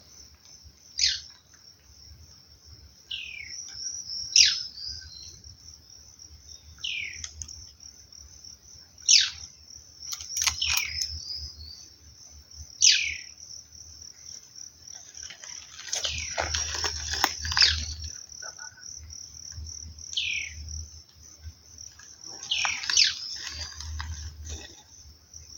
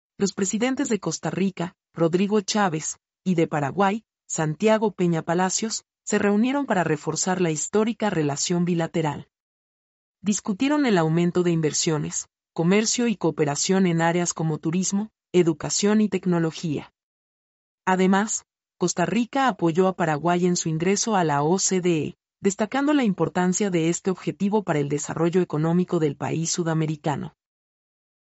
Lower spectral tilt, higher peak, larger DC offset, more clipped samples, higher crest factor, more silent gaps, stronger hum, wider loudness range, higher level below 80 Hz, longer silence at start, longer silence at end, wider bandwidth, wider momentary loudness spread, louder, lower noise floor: second, 1 dB/octave vs -5 dB/octave; first, -4 dBFS vs -8 dBFS; neither; neither; first, 28 dB vs 16 dB; second, none vs 9.40-10.14 s, 17.03-17.78 s; neither; first, 10 LU vs 2 LU; first, -48 dBFS vs -64 dBFS; second, 0 s vs 0.2 s; second, 0 s vs 0.9 s; first, 17 kHz vs 8.2 kHz; first, 26 LU vs 7 LU; about the same, -25 LUFS vs -23 LUFS; second, -55 dBFS vs under -90 dBFS